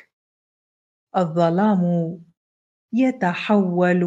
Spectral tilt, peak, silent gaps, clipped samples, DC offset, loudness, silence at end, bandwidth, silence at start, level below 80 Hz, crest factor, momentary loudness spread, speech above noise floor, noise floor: -8.5 dB/octave; -4 dBFS; 2.37-2.89 s; under 0.1%; under 0.1%; -20 LUFS; 0 s; 7.8 kHz; 1.15 s; -72 dBFS; 16 dB; 9 LU; over 71 dB; under -90 dBFS